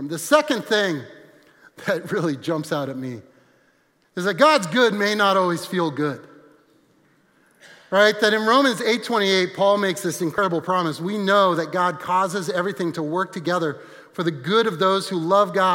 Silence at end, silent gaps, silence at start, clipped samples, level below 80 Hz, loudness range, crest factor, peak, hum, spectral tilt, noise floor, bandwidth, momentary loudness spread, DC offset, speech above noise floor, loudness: 0 s; none; 0 s; under 0.1%; -72 dBFS; 4 LU; 20 dB; -2 dBFS; none; -4.5 dB/octave; -62 dBFS; 16.5 kHz; 10 LU; under 0.1%; 42 dB; -21 LUFS